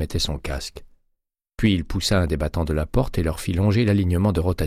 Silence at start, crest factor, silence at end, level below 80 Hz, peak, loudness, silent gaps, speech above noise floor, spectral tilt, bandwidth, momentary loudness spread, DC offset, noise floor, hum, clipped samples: 0 s; 16 dB; 0 s; -32 dBFS; -6 dBFS; -22 LUFS; none; 54 dB; -6 dB/octave; 15.5 kHz; 7 LU; under 0.1%; -75 dBFS; none; under 0.1%